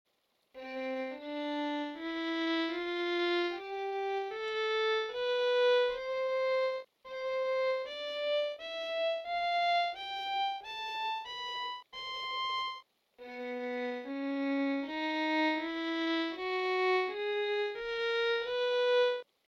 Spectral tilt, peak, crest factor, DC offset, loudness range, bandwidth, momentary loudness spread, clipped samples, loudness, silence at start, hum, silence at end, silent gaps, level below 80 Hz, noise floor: -2.5 dB/octave; -20 dBFS; 12 dB; under 0.1%; 5 LU; 7.8 kHz; 9 LU; under 0.1%; -33 LUFS; 0.55 s; none; 0.25 s; none; -74 dBFS; -74 dBFS